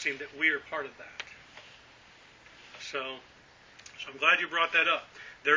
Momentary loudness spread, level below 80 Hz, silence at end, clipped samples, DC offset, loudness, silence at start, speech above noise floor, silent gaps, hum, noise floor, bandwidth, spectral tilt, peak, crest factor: 25 LU; -72 dBFS; 0 s; under 0.1%; under 0.1%; -28 LUFS; 0 s; 25 dB; none; none; -56 dBFS; 7.6 kHz; -1.5 dB/octave; -8 dBFS; 24 dB